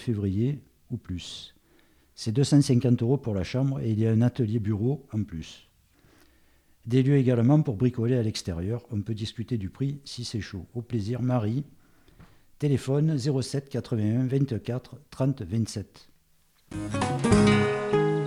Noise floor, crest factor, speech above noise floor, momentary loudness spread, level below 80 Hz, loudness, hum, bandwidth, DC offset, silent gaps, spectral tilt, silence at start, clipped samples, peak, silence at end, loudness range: -63 dBFS; 18 dB; 38 dB; 15 LU; -52 dBFS; -27 LUFS; none; 12 kHz; under 0.1%; none; -7 dB/octave; 0 s; under 0.1%; -8 dBFS; 0 s; 6 LU